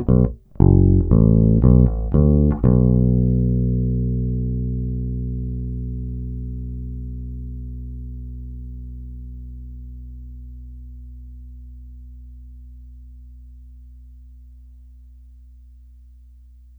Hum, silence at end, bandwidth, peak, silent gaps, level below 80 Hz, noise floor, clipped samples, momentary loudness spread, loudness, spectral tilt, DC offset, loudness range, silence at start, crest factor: none; 2 s; 1.9 kHz; 0 dBFS; none; -26 dBFS; -45 dBFS; under 0.1%; 25 LU; -19 LUFS; -14.5 dB/octave; under 0.1%; 25 LU; 0 s; 20 dB